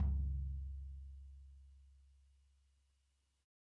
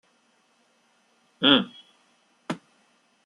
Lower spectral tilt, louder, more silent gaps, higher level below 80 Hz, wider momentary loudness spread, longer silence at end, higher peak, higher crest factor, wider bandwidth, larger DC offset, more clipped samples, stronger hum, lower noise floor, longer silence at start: first, -10 dB/octave vs -5 dB/octave; second, -45 LUFS vs -23 LUFS; neither; first, -46 dBFS vs -68 dBFS; first, 23 LU vs 19 LU; first, 1.65 s vs 0.7 s; second, -28 dBFS vs -4 dBFS; second, 16 dB vs 26 dB; second, 1.4 kHz vs 11 kHz; neither; neither; neither; first, -80 dBFS vs -66 dBFS; second, 0 s vs 1.4 s